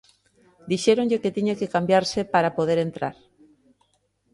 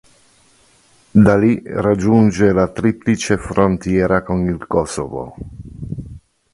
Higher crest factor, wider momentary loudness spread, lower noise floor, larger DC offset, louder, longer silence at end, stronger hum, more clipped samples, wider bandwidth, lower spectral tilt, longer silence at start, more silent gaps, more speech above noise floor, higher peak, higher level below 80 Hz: about the same, 20 dB vs 16 dB; second, 8 LU vs 17 LU; first, -68 dBFS vs -53 dBFS; neither; second, -23 LUFS vs -16 LUFS; first, 1.2 s vs 0.35 s; first, 50 Hz at -50 dBFS vs none; neither; about the same, 11.5 kHz vs 11.5 kHz; second, -5.5 dB/octave vs -7 dB/octave; second, 0.65 s vs 1.15 s; neither; first, 46 dB vs 38 dB; second, -4 dBFS vs 0 dBFS; second, -62 dBFS vs -38 dBFS